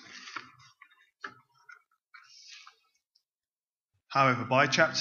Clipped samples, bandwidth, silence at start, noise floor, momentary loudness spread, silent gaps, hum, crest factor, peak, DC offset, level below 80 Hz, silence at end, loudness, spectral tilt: under 0.1%; 7.2 kHz; 0.1 s; under -90 dBFS; 25 LU; 3.35-3.40 s, 3.56-3.88 s; none; 26 dB; -8 dBFS; under 0.1%; -80 dBFS; 0 s; -26 LUFS; -4 dB/octave